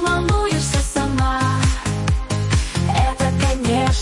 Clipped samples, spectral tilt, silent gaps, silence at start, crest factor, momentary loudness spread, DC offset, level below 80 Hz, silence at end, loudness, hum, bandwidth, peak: under 0.1%; -5 dB/octave; none; 0 s; 12 dB; 3 LU; under 0.1%; -24 dBFS; 0 s; -19 LUFS; none; 11.5 kHz; -6 dBFS